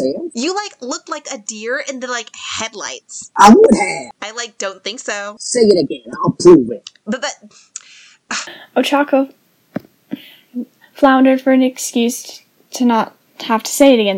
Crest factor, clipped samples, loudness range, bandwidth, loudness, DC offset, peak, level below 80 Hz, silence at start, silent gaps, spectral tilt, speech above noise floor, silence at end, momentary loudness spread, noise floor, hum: 16 dB; 0.6%; 8 LU; 16.5 kHz; -15 LUFS; under 0.1%; 0 dBFS; -52 dBFS; 0 s; none; -4 dB/octave; 30 dB; 0 s; 21 LU; -44 dBFS; none